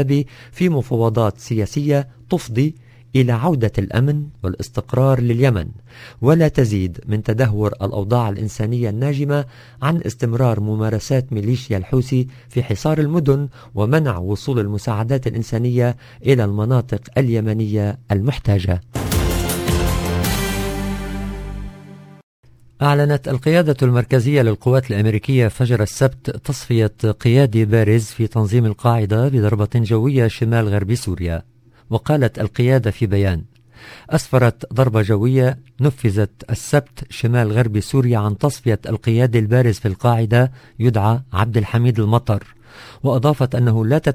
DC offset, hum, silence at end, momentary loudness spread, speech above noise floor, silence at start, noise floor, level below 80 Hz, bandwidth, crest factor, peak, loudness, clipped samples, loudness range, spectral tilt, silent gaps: under 0.1%; none; 0 s; 8 LU; 22 dB; 0 s; -39 dBFS; -34 dBFS; 16 kHz; 18 dB; 0 dBFS; -18 LUFS; under 0.1%; 3 LU; -7 dB/octave; 22.23-22.43 s